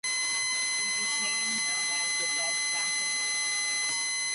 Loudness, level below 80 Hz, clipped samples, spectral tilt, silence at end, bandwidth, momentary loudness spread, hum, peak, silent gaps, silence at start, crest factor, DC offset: -27 LUFS; -80 dBFS; under 0.1%; 2.5 dB/octave; 0 s; 11.5 kHz; 0 LU; none; -18 dBFS; none; 0.05 s; 12 dB; under 0.1%